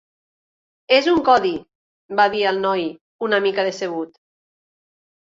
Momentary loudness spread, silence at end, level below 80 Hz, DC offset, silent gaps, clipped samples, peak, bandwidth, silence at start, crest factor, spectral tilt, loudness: 14 LU; 1.15 s; -60 dBFS; under 0.1%; 1.75-2.09 s, 3.01-3.19 s; under 0.1%; -2 dBFS; 7.8 kHz; 0.9 s; 20 dB; -4.5 dB/octave; -19 LUFS